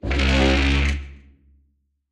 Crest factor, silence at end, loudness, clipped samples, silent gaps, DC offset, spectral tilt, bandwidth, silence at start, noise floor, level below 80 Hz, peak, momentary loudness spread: 16 dB; 0.95 s; -20 LUFS; under 0.1%; none; under 0.1%; -5.5 dB/octave; 9.4 kHz; 0.05 s; -66 dBFS; -24 dBFS; -6 dBFS; 14 LU